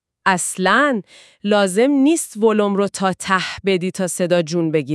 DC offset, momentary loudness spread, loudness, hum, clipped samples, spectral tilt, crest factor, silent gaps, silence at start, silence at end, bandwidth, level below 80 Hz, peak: under 0.1%; 6 LU; -18 LUFS; none; under 0.1%; -4.5 dB/octave; 18 dB; none; 0.25 s; 0 s; 12 kHz; -60 dBFS; 0 dBFS